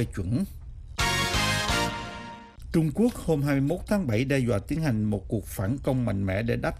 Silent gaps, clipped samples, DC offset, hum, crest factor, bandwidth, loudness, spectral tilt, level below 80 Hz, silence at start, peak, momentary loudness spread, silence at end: none; under 0.1%; under 0.1%; none; 14 dB; 15.5 kHz; -27 LUFS; -5.5 dB/octave; -40 dBFS; 0 s; -12 dBFS; 11 LU; 0 s